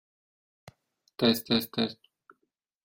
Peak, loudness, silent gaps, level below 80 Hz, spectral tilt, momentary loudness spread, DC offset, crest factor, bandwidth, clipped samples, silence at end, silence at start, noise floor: -12 dBFS; -28 LUFS; none; -68 dBFS; -4.5 dB/octave; 22 LU; under 0.1%; 20 dB; 16.5 kHz; under 0.1%; 0.9 s; 1.2 s; -80 dBFS